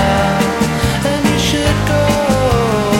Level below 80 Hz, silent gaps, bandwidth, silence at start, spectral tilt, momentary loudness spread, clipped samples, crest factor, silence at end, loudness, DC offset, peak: -26 dBFS; none; 16.5 kHz; 0 s; -5 dB/octave; 2 LU; under 0.1%; 10 dB; 0 s; -14 LUFS; under 0.1%; -2 dBFS